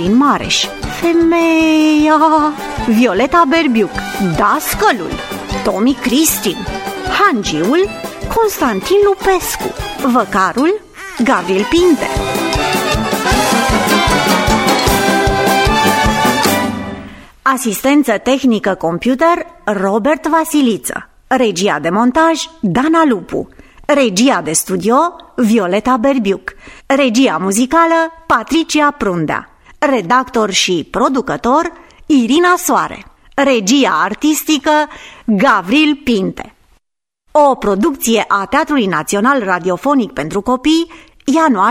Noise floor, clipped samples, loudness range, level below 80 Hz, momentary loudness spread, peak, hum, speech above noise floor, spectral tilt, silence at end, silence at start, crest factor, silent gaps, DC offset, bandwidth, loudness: -68 dBFS; under 0.1%; 3 LU; -34 dBFS; 8 LU; 0 dBFS; none; 56 dB; -4 dB/octave; 0 s; 0 s; 14 dB; none; under 0.1%; 16.5 kHz; -13 LUFS